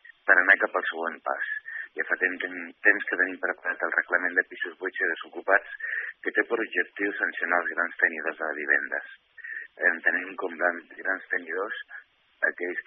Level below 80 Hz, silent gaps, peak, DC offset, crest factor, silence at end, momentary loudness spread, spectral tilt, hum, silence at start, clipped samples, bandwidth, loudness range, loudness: -82 dBFS; none; -4 dBFS; under 0.1%; 24 dB; 0.05 s; 12 LU; 0.5 dB/octave; none; 0.25 s; under 0.1%; 3.9 kHz; 3 LU; -26 LUFS